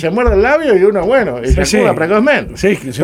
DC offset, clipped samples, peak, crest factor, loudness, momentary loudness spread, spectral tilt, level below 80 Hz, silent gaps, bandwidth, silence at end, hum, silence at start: under 0.1%; under 0.1%; 0 dBFS; 12 dB; -12 LUFS; 4 LU; -5.5 dB/octave; -24 dBFS; none; 16 kHz; 0 s; none; 0 s